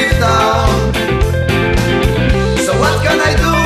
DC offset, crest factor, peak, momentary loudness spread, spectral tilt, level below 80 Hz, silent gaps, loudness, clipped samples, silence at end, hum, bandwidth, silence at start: under 0.1%; 12 dB; 0 dBFS; 3 LU; -5 dB/octave; -20 dBFS; none; -13 LUFS; under 0.1%; 0 s; none; 14 kHz; 0 s